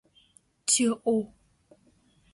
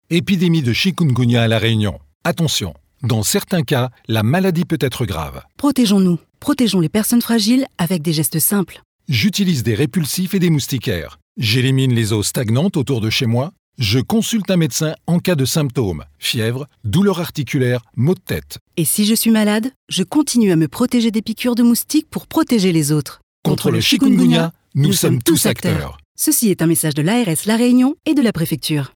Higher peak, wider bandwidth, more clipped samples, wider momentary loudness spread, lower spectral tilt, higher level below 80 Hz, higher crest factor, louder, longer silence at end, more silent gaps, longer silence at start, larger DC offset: second, -10 dBFS vs -2 dBFS; second, 11.5 kHz vs over 20 kHz; neither; first, 11 LU vs 8 LU; second, -2.5 dB/octave vs -5 dB/octave; second, -70 dBFS vs -48 dBFS; first, 20 dB vs 14 dB; second, -26 LUFS vs -17 LUFS; first, 1.05 s vs 0.1 s; second, none vs 2.15-2.21 s, 8.85-8.99 s, 11.22-11.35 s, 13.59-13.73 s, 18.61-18.66 s, 19.76-19.87 s, 23.23-23.43 s, 26.05-26.15 s; first, 0.65 s vs 0.1 s; neither